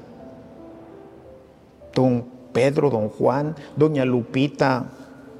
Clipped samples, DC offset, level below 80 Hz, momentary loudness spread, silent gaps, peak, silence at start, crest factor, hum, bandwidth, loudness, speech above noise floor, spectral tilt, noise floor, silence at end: under 0.1%; under 0.1%; -60 dBFS; 23 LU; none; -4 dBFS; 0 s; 18 dB; none; 11.5 kHz; -22 LUFS; 28 dB; -7.5 dB/octave; -48 dBFS; 0 s